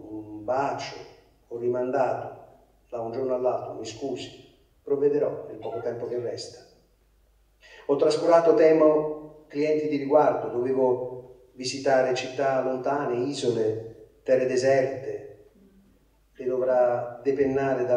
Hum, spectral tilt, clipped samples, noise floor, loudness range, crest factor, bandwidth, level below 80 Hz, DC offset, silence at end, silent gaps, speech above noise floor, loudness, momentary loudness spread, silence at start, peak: none; -5.5 dB/octave; under 0.1%; -62 dBFS; 8 LU; 20 dB; 10.5 kHz; -64 dBFS; under 0.1%; 0 s; none; 38 dB; -25 LUFS; 17 LU; 0 s; -6 dBFS